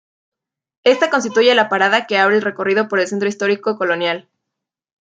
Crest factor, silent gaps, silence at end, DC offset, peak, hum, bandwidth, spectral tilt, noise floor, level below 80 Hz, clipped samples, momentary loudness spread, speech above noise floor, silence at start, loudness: 16 dB; none; 0.8 s; under 0.1%; -2 dBFS; none; 9.2 kHz; -3.5 dB/octave; -82 dBFS; -70 dBFS; under 0.1%; 6 LU; 66 dB; 0.85 s; -16 LUFS